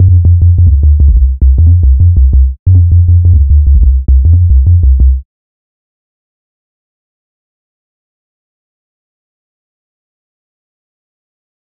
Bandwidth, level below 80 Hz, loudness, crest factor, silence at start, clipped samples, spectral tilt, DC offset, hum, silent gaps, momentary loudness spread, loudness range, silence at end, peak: 0.7 kHz; -10 dBFS; -8 LUFS; 8 dB; 0 s; 0.2%; -16.5 dB/octave; under 0.1%; none; 2.59-2.66 s; 3 LU; 7 LU; 6.45 s; 0 dBFS